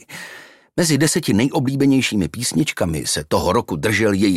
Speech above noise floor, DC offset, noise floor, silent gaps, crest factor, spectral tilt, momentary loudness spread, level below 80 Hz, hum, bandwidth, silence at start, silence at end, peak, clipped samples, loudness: 24 dB; under 0.1%; -41 dBFS; none; 16 dB; -4.5 dB/octave; 7 LU; -44 dBFS; none; 15.5 kHz; 0.1 s; 0 s; -4 dBFS; under 0.1%; -18 LUFS